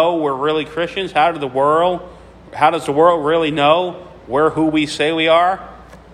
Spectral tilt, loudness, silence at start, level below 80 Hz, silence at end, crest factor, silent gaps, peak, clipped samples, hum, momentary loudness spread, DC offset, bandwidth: -5 dB/octave; -16 LUFS; 0 s; -48 dBFS; 0.15 s; 16 dB; none; 0 dBFS; under 0.1%; none; 9 LU; under 0.1%; 12 kHz